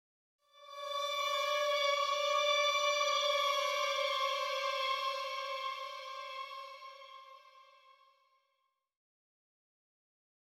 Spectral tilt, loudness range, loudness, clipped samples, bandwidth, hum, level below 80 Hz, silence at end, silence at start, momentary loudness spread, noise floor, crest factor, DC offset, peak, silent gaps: 5.5 dB/octave; 17 LU; -33 LUFS; under 0.1%; 16.5 kHz; none; under -90 dBFS; 2.85 s; 0.55 s; 17 LU; -82 dBFS; 18 dB; under 0.1%; -20 dBFS; none